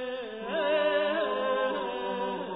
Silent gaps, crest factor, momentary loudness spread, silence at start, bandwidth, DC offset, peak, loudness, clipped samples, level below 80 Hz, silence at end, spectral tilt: none; 14 dB; 8 LU; 0 s; 5 kHz; under 0.1%; -16 dBFS; -29 LUFS; under 0.1%; -70 dBFS; 0 s; -7.5 dB/octave